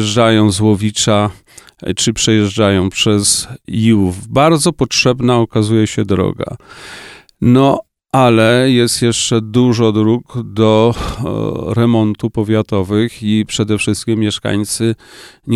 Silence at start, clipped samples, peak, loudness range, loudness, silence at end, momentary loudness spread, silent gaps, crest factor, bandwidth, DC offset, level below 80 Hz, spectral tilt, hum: 0 s; under 0.1%; 0 dBFS; 3 LU; -13 LUFS; 0 s; 9 LU; none; 14 dB; 14 kHz; under 0.1%; -40 dBFS; -5 dB/octave; none